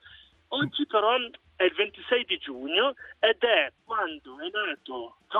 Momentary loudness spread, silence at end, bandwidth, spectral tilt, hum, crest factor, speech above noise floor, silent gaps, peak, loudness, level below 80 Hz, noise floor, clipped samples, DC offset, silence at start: 11 LU; 0 s; 4.6 kHz; -6.5 dB/octave; none; 18 dB; 27 dB; none; -10 dBFS; -27 LUFS; -68 dBFS; -54 dBFS; under 0.1%; under 0.1%; 0.05 s